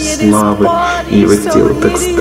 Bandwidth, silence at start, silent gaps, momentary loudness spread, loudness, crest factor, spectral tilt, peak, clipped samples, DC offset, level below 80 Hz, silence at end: 16 kHz; 0 s; none; 3 LU; -10 LUFS; 10 dB; -5 dB/octave; 0 dBFS; under 0.1%; under 0.1%; -30 dBFS; 0 s